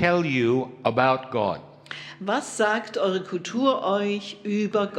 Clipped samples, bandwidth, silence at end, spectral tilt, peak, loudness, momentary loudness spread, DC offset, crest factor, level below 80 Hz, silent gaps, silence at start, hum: under 0.1%; 11.5 kHz; 0 s; -5.5 dB/octave; -4 dBFS; -24 LUFS; 10 LU; under 0.1%; 20 dB; -64 dBFS; none; 0 s; none